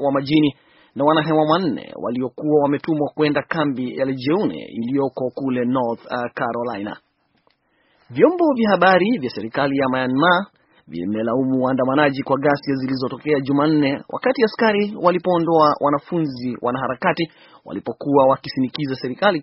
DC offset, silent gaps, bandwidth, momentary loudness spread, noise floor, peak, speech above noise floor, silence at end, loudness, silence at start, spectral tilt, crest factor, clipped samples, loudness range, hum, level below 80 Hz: under 0.1%; none; 5.8 kHz; 10 LU; -63 dBFS; 0 dBFS; 44 dB; 0 s; -19 LUFS; 0 s; -4.5 dB/octave; 20 dB; under 0.1%; 4 LU; none; -60 dBFS